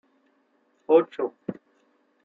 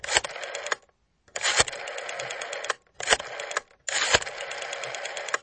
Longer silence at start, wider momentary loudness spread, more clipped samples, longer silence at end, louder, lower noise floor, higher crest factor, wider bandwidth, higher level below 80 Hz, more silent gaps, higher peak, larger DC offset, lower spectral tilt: first, 0.9 s vs 0 s; first, 25 LU vs 11 LU; neither; first, 0.7 s vs 0 s; first, -24 LUFS vs -28 LUFS; about the same, -67 dBFS vs -64 dBFS; second, 22 dB vs 28 dB; second, 4.2 kHz vs 8.8 kHz; second, -78 dBFS vs -56 dBFS; neither; second, -6 dBFS vs 0 dBFS; neither; first, -5.5 dB/octave vs 0 dB/octave